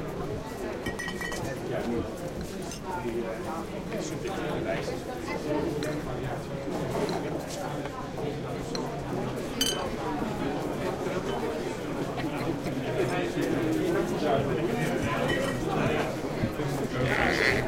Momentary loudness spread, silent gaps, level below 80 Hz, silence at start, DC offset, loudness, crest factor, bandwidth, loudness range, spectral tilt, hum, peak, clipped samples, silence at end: 7 LU; none; -46 dBFS; 0 s; under 0.1%; -31 LUFS; 22 dB; 16.5 kHz; 5 LU; -5 dB/octave; none; -8 dBFS; under 0.1%; 0 s